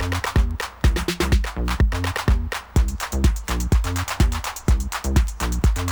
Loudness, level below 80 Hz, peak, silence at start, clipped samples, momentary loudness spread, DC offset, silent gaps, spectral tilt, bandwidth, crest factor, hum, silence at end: -23 LUFS; -22 dBFS; -6 dBFS; 0 s; under 0.1%; 3 LU; under 0.1%; none; -5 dB/octave; over 20 kHz; 14 dB; none; 0 s